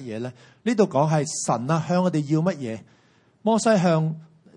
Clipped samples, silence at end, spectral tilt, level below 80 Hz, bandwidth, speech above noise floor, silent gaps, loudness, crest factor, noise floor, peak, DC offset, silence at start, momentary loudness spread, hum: under 0.1%; 0.3 s; -6 dB/octave; -68 dBFS; 11 kHz; 36 dB; none; -23 LUFS; 18 dB; -59 dBFS; -6 dBFS; under 0.1%; 0 s; 14 LU; none